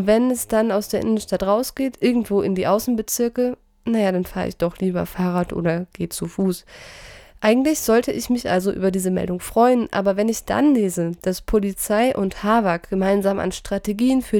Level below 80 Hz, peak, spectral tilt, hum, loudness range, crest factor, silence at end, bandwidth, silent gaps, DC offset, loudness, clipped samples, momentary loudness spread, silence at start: -44 dBFS; -4 dBFS; -5.5 dB/octave; none; 4 LU; 16 dB; 0 s; 19.5 kHz; none; under 0.1%; -21 LUFS; under 0.1%; 7 LU; 0 s